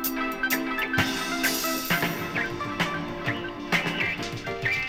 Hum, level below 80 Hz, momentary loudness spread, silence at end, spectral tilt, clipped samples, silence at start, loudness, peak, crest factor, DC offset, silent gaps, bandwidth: none; -50 dBFS; 5 LU; 0 s; -3.5 dB/octave; under 0.1%; 0 s; -27 LUFS; -8 dBFS; 18 dB; under 0.1%; none; over 20 kHz